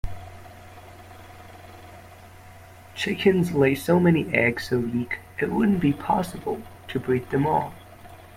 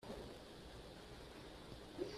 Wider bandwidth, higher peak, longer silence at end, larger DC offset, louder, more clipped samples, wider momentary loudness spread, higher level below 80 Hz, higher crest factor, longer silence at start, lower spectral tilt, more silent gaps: first, 16 kHz vs 14.5 kHz; first, -4 dBFS vs -32 dBFS; about the same, 0 s vs 0 s; neither; first, -23 LUFS vs -55 LUFS; neither; first, 25 LU vs 4 LU; first, -48 dBFS vs -64 dBFS; about the same, 22 dB vs 20 dB; about the same, 0.05 s vs 0 s; first, -6.5 dB/octave vs -5 dB/octave; neither